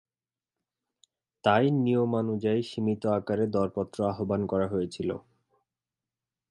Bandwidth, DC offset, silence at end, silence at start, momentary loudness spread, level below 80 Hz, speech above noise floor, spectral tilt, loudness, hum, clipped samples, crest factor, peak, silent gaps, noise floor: 11.5 kHz; under 0.1%; 1.3 s; 1.45 s; 7 LU; -60 dBFS; over 63 dB; -7.5 dB/octave; -28 LUFS; none; under 0.1%; 22 dB; -8 dBFS; none; under -90 dBFS